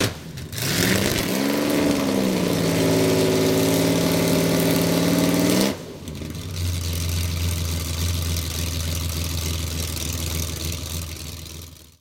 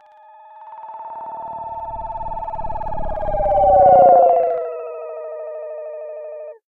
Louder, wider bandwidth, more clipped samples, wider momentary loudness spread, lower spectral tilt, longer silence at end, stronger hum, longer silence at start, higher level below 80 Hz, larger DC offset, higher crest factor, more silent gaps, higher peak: second, -22 LUFS vs -16 LUFS; first, 17 kHz vs 3.6 kHz; neither; second, 13 LU vs 21 LU; second, -4.5 dB/octave vs -9.5 dB/octave; about the same, 0.2 s vs 0.15 s; neither; second, 0 s vs 0.45 s; about the same, -36 dBFS vs -36 dBFS; neither; about the same, 22 dB vs 18 dB; neither; about the same, 0 dBFS vs -2 dBFS